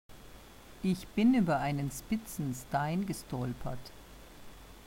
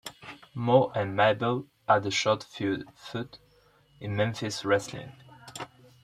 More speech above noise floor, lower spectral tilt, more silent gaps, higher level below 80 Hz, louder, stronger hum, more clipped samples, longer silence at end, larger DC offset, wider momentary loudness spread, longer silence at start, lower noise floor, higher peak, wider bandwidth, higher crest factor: second, 20 dB vs 35 dB; first, -6.5 dB/octave vs -5 dB/octave; neither; first, -54 dBFS vs -66 dBFS; second, -33 LUFS vs -28 LUFS; neither; neither; second, 0 s vs 0.35 s; neither; first, 25 LU vs 19 LU; about the same, 0.1 s vs 0.05 s; second, -52 dBFS vs -62 dBFS; second, -18 dBFS vs -8 dBFS; first, 16 kHz vs 13.5 kHz; second, 16 dB vs 22 dB